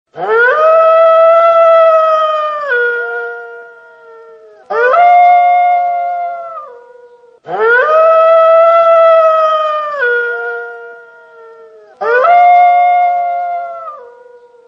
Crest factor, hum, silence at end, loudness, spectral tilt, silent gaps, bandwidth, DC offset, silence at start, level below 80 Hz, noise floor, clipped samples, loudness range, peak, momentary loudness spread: 10 dB; none; 0.65 s; -9 LUFS; -3 dB/octave; none; 6 kHz; under 0.1%; 0.15 s; -70 dBFS; -41 dBFS; under 0.1%; 5 LU; 0 dBFS; 17 LU